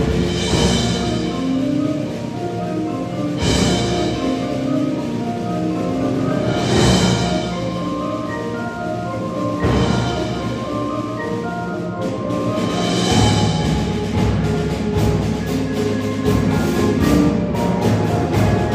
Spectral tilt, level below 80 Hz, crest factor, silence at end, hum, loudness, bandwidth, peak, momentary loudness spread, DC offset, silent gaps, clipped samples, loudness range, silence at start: -6 dB/octave; -32 dBFS; 16 dB; 0 s; none; -19 LUFS; 15.5 kHz; -2 dBFS; 8 LU; under 0.1%; none; under 0.1%; 3 LU; 0 s